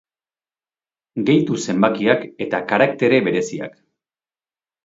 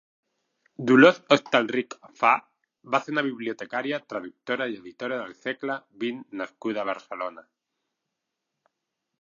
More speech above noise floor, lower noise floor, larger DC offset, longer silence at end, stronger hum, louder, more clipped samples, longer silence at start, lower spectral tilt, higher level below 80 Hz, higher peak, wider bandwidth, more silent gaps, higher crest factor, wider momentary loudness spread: first, over 72 dB vs 58 dB; first, under -90 dBFS vs -83 dBFS; neither; second, 1.15 s vs 1.8 s; neither; first, -18 LUFS vs -25 LUFS; neither; first, 1.15 s vs 0.8 s; about the same, -5.5 dB/octave vs -5.5 dB/octave; first, -62 dBFS vs -80 dBFS; about the same, 0 dBFS vs -2 dBFS; about the same, 8 kHz vs 7.4 kHz; neither; about the same, 20 dB vs 24 dB; second, 12 LU vs 17 LU